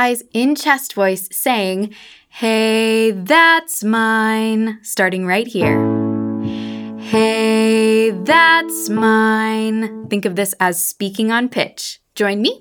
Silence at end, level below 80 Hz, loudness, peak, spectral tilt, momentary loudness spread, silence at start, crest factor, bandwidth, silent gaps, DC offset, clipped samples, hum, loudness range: 0.05 s; -58 dBFS; -16 LUFS; 0 dBFS; -4 dB/octave; 10 LU; 0 s; 16 dB; over 20 kHz; none; under 0.1%; under 0.1%; none; 4 LU